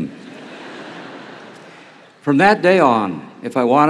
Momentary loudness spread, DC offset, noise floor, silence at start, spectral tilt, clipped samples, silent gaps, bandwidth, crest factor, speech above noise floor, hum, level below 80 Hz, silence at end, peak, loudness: 24 LU; under 0.1%; -44 dBFS; 0 s; -6.5 dB/octave; under 0.1%; none; 11.5 kHz; 18 dB; 29 dB; none; -64 dBFS; 0 s; 0 dBFS; -15 LUFS